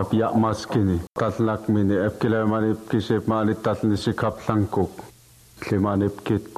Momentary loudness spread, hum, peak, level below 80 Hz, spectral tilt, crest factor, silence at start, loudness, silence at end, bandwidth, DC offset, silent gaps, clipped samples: 5 LU; none; -6 dBFS; -50 dBFS; -7.5 dB/octave; 18 dB; 0 s; -23 LUFS; 0 s; 14 kHz; under 0.1%; none; under 0.1%